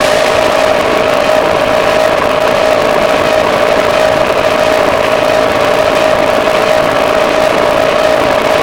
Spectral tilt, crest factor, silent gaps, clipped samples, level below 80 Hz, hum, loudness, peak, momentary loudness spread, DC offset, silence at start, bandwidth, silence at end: -3.5 dB/octave; 10 dB; none; 0.2%; -36 dBFS; none; -9 LUFS; 0 dBFS; 1 LU; under 0.1%; 0 s; 17.5 kHz; 0 s